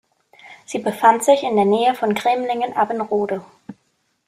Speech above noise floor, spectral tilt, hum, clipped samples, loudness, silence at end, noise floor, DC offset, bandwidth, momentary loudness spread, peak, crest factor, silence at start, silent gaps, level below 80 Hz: 49 dB; -4.5 dB/octave; none; under 0.1%; -18 LUFS; 0.55 s; -67 dBFS; under 0.1%; 15 kHz; 10 LU; -2 dBFS; 18 dB; 0.45 s; none; -66 dBFS